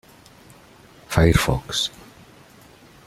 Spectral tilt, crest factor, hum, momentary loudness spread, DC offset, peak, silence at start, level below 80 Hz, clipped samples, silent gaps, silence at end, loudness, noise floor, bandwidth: -5 dB/octave; 22 dB; none; 8 LU; under 0.1%; -2 dBFS; 1.1 s; -36 dBFS; under 0.1%; none; 1.2 s; -21 LUFS; -49 dBFS; 15.5 kHz